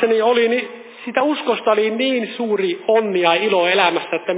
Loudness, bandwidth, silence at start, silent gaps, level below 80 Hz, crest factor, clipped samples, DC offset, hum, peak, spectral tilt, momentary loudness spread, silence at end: -17 LUFS; 4 kHz; 0 s; none; -86 dBFS; 16 dB; under 0.1%; under 0.1%; none; 0 dBFS; -8 dB/octave; 7 LU; 0 s